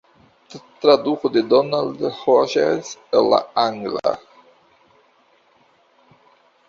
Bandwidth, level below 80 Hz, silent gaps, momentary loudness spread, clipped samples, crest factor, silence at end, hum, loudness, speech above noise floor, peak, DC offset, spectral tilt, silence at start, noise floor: 7.4 kHz; -64 dBFS; none; 8 LU; under 0.1%; 20 dB; 2.5 s; none; -19 LUFS; 40 dB; -2 dBFS; under 0.1%; -5 dB/octave; 0.55 s; -58 dBFS